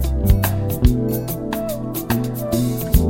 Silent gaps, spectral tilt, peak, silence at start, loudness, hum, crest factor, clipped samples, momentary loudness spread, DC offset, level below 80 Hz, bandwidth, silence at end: none; -6.5 dB/octave; -2 dBFS; 0 s; -20 LUFS; none; 16 dB; under 0.1%; 7 LU; under 0.1%; -24 dBFS; 17 kHz; 0 s